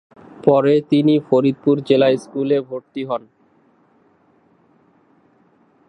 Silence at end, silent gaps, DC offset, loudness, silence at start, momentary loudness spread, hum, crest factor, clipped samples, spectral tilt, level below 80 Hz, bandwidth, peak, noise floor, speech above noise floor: 2.7 s; none; under 0.1%; -17 LUFS; 0.45 s; 11 LU; none; 18 dB; under 0.1%; -8 dB/octave; -68 dBFS; 10 kHz; 0 dBFS; -57 dBFS; 40 dB